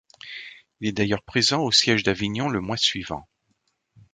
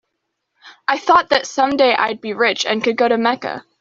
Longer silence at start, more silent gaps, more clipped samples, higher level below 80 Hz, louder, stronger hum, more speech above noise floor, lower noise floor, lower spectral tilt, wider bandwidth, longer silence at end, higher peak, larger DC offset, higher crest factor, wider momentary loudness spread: second, 0.25 s vs 0.65 s; neither; neither; first, -52 dBFS vs -58 dBFS; second, -22 LUFS vs -16 LUFS; neither; second, 49 dB vs 58 dB; about the same, -72 dBFS vs -75 dBFS; about the same, -3.5 dB/octave vs -3 dB/octave; first, 9.6 kHz vs 7.8 kHz; first, 0.9 s vs 0.2 s; about the same, -4 dBFS vs -2 dBFS; neither; first, 22 dB vs 16 dB; first, 19 LU vs 8 LU